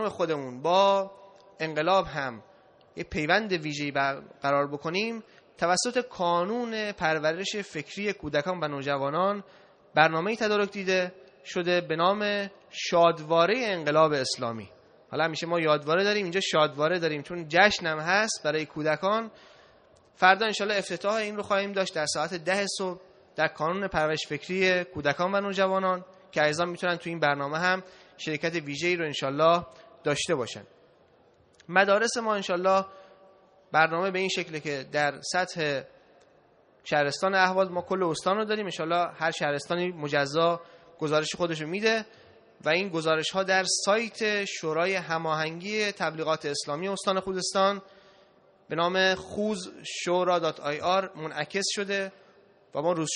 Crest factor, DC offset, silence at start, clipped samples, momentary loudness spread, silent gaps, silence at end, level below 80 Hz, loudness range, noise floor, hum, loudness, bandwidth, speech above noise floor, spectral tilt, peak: 24 dB; under 0.1%; 0 s; under 0.1%; 10 LU; none; 0 s; -64 dBFS; 3 LU; -61 dBFS; none; -27 LUFS; 10 kHz; 34 dB; -3.5 dB/octave; -4 dBFS